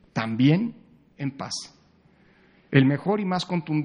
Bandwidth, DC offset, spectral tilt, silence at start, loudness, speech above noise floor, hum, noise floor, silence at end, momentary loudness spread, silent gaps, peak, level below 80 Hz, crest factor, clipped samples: 10 kHz; under 0.1%; -6.5 dB/octave; 0.15 s; -24 LUFS; 35 dB; none; -58 dBFS; 0 s; 13 LU; none; -2 dBFS; -66 dBFS; 22 dB; under 0.1%